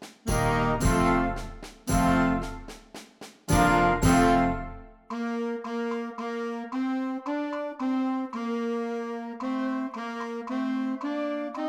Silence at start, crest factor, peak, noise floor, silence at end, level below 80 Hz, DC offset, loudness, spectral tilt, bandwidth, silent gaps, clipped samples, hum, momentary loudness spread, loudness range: 0 s; 18 dB; -8 dBFS; -47 dBFS; 0 s; -38 dBFS; under 0.1%; -27 LUFS; -6 dB/octave; 19.5 kHz; none; under 0.1%; none; 17 LU; 6 LU